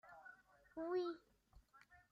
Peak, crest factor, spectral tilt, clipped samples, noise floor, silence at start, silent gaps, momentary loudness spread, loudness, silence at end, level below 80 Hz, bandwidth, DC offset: -32 dBFS; 18 dB; -6 dB/octave; under 0.1%; -71 dBFS; 0.05 s; none; 24 LU; -46 LUFS; 0.15 s; -78 dBFS; 7 kHz; under 0.1%